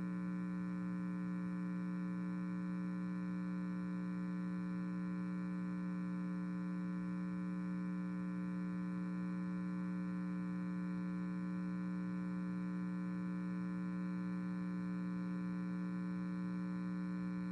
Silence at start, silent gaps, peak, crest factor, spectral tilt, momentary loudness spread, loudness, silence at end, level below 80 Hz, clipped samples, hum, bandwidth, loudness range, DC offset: 0 s; none; -34 dBFS; 6 dB; -9.5 dB/octave; 0 LU; -42 LUFS; 0 s; -74 dBFS; under 0.1%; 60 Hz at -40 dBFS; 5.8 kHz; 0 LU; under 0.1%